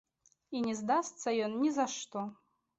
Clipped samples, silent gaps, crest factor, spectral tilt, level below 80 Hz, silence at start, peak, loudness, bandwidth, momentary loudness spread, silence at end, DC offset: under 0.1%; none; 16 dB; -4 dB/octave; -78 dBFS; 0.5 s; -18 dBFS; -34 LUFS; 8.2 kHz; 10 LU; 0.45 s; under 0.1%